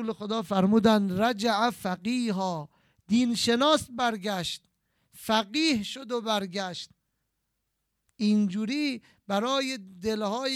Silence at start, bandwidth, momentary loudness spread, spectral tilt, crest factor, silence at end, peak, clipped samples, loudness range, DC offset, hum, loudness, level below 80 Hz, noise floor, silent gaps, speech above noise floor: 0 s; 15.5 kHz; 10 LU; -4.5 dB/octave; 20 dB; 0 s; -8 dBFS; under 0.1%; 5 LU; under 0.1%; none; -27 LUFS; -64 dBFS; -79 dBFS; none; 53 dB